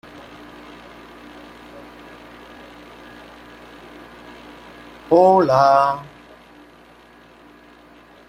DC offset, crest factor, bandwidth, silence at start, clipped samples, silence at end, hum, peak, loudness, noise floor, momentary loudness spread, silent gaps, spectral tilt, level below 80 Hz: under 0.1%; 22 dB; 15.5 kHz; 1.75 s; under 0.1%; 2.25 s; none; -2 dBFS; -15 LUFS; -48 dBFS; 27 LU; none; -6.5 dB/octave; -56 dBFS